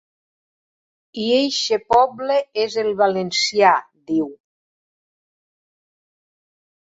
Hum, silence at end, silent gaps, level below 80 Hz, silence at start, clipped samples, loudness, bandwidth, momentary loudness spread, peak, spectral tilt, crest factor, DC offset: none; 2.55 s; none; -62 dBFS; 1.15 s; under 0.1%; -19 LUFS; 8 kHz; 8 LU; -2 dBFS; -3 dB/octave; 20 dB; under 0.1%